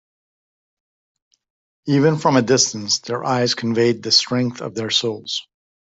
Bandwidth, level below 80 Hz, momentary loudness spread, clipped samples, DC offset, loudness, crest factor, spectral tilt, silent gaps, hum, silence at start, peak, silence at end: 8.2 kHz; -62 dBFS; 11 LU; under 0.1%; under 0.1%; -18 LUFS; 18 dB; -4 dB/octave; none; none; 1.85 s; -2 dBFS; 0.45 s